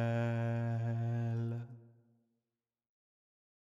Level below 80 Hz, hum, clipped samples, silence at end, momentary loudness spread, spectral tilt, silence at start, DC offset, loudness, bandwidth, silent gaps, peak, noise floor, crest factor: -78 dBFS; none; under 0.1%; 1.85 s; 8 LU; -9 dB/octave; 0 s; under 0.1%; -37 LUFS; 7.2 kHz; none; -26 dBFS; under -90 dBFS; 14 dB